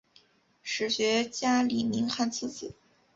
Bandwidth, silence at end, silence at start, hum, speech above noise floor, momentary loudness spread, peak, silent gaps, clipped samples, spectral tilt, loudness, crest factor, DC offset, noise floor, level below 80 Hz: 7.8 kHz; 0.45 s; 0.65 s; none; 35 dB; 15 LU; -14 dBFS; none; under 0.1%; -3 dB/octave; -29 LUFS; 16 dB; under 0.1%; -63 dBFS; -68 dBFS